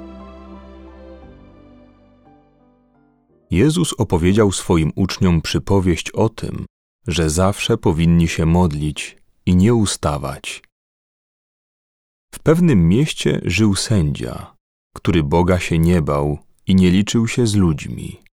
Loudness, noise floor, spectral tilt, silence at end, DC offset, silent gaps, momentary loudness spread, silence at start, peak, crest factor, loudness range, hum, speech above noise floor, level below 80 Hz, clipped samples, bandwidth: -17 LUFS; -56 dBFS; -6 dB/octave; 0.2 s; under 0.1%; 6.70-6.99 s, 10.72-12.28 s, 14.60-14.91 s; 15 LU; 0 s; -2 dBFS; 16 dB; 4 LU; none; 40 dB; -34 dBFS; under 0.1%; 15 kHz